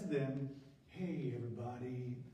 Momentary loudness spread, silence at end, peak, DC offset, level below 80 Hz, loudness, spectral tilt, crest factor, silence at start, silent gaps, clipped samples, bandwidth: 10 LU; 0 s; -26 dBFS; under 0.1%; -74 dBFS; -43 LUFS; -8.5 dB/octave; 16 dB; 0 s; none; under 0.1%; 9.4 kHz